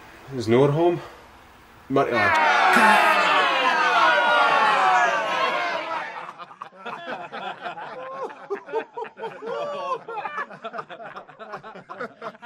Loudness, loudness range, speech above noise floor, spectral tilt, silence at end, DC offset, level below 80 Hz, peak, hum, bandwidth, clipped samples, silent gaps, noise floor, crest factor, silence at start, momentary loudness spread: -20 LUFS; 15 LU; 30 dB; -4.5 dB/octave; 0 s; under 0.1%; -66 dBFS; -2 dBFS; none; 16 kHz; under 0.1%; none; -49 dBFS; 22 dB; 0 s; 21 LU